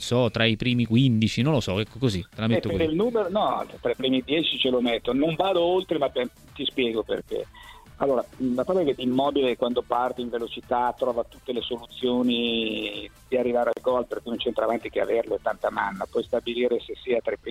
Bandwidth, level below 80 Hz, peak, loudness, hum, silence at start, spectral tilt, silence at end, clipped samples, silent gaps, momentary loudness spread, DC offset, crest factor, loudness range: 15 kHz; -52 dBFS; -6 dBFS; -25 LUFS; none; 0 s; -6 dB/octave; 0 s; under 0.1%; none; 8 LU; under 0.1%; 18 dB; 3 LU